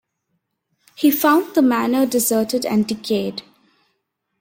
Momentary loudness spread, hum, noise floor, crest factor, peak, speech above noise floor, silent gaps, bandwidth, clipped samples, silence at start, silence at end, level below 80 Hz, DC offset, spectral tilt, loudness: 7 LU; none; -73 dBFS; 16 dB; -4 dBFS; 56 dB; none; 16.5 kHz; under 0.1%; 1 s; 1 s; -62 dBFS; under 0.1%; -4 dB/octave; -18 LUFS